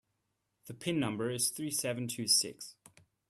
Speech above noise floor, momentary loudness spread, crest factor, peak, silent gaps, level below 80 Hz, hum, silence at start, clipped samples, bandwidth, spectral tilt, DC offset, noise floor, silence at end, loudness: 48 dB; 19 LU; 22 dB; -16 dBFS; none; -74 dBFS; none; 0.65 s; under 0.1%; 15.5 kHz; -3 dB/octave; under 0.1%; -82 dBFS; 0.55 s; -32 LUFS